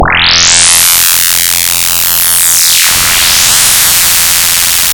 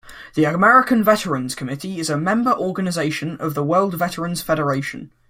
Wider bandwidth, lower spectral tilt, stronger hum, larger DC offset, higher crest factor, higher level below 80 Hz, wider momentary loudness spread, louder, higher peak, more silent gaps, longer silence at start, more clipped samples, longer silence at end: first, over 20 kHz vs 16.5 kHz; second, 1 dB/octave vs -5.5 dB/octave; neither; neither; second, 6 dB vs 18 dB; first, -30 dBFS vs -54 dBFS; second, 3 LU vs 12 LU; first, -4 LUFS vs -19 LUFS; about the same, 0 dBFS vs -2 dBFS; neither; about the same, 0 s vs 0.05 s; first, 0.4% vs under 0.1%; second, 0 s vs 0.25 s